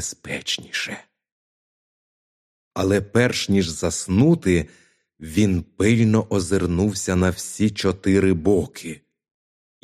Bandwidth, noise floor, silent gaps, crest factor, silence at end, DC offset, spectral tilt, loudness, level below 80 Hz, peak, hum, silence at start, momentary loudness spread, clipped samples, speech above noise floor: 15 kHz; under -90 dBFS; 1.32-2.71 s; 18 dB; 0.9 s; under 0.1%; -5.5 dB/octave; -21 LUFS; -46 dBFS; -4 dBFS; none; 0 s; 13 LU; under 0.1%; over 70 dB